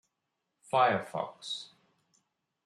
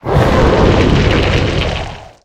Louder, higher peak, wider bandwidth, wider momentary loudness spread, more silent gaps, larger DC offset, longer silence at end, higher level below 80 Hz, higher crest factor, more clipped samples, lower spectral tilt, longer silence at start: second, -31 LUFS vs -12 LUFS; second, -12 dBFS vs 0 dBFS; about the same, 12.5 kHz vs 12 kHz; first, 13 LU vs 9 LU; neither; neither; first, 1 s vs 0.2 s; second, -84 dBFS vs -18 dBFS; first, 22 dB vs 10 dB; neither; second, -4 dB/octave vs -6.5 dB/octave; first, 0.75 s vs 0.05 s